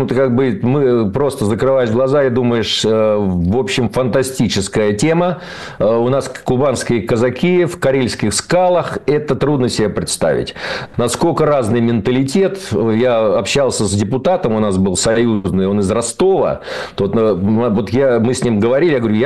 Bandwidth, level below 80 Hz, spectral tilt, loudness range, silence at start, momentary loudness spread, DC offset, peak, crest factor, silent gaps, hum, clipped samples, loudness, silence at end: 12.5 kHz; -42 dBFS; -5.5 dB/octave; 1 LU; 0 s; 4 LU; 0.6%; -6 dBFS; 8 dB; none; none; under 0.1%; -15 LUFS; 0 s